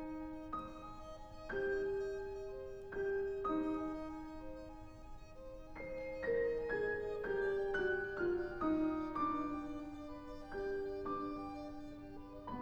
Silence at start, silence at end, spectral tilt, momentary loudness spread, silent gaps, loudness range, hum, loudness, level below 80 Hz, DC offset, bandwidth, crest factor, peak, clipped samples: 0 s; 0 s; -7 dB/octave; 15 LU; none; 5 LU; none; -41 LUFS; -56 dBFS; under 0.1%; 8.2 kHz; 16 dB; -26 dBFS; under 0.1%